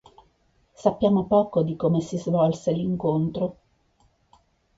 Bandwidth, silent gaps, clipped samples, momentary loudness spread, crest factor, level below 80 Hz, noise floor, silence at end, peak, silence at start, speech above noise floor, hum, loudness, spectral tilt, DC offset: 7.8 kHz; none; under 0.1%; 5 LU; 18 dB; -56 dBFS; -64 dBFS; 1.25 s; -6 dBFS; 0.8 s; 42 dB; none; -24 LUFS; -8.5 dB/octave; under 0.1%